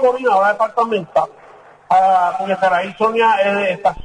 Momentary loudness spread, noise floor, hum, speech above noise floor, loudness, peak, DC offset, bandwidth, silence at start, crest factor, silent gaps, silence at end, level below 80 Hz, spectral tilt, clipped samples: 5 LU; -43 dBFS; none; 28 dB; -16 LUFS; -4 dBFS; under 0.1%; 10.5 kHz; 0 s; 12 dB; none; 0 s; -48 dBFS; -5 dB/octave; under 0.1%